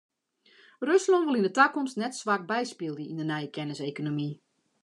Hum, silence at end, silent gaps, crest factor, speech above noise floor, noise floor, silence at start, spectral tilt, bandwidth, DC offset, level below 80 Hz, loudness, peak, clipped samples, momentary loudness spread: none; 0.5 s; none; 22 dB; 35 dB; -63 dBFS; 0.8 s; -5 dB/octave; 11 kHz; under 0.1%; -84 dBFS; -28 LUFS; -8 dBFS; under 0.1%; 12 LU